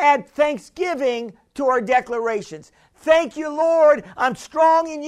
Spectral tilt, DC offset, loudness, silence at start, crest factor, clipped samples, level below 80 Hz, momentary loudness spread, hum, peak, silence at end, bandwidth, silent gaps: -4 dB/octave; under 0.1%; -19 LUFS; 0 s; 16 dB; under 0.1%; -58 dBFS; 12 LU; none; -2 dBFS; 0 s; 11.5 kHz; none